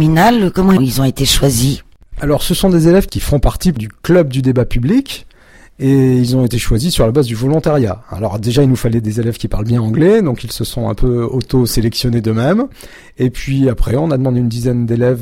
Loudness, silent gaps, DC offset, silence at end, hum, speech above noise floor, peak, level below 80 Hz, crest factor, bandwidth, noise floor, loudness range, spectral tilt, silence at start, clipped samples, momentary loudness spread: -14 LUFS; none; under 0.1%; 0 s; none; 30 dB; 0 dBFS; -26 dBFS; 12 dB; 16.5 kHz; -43 dBFS; 2 LU; -6 dB/octave; 0 s; under 0.1%; 8 LU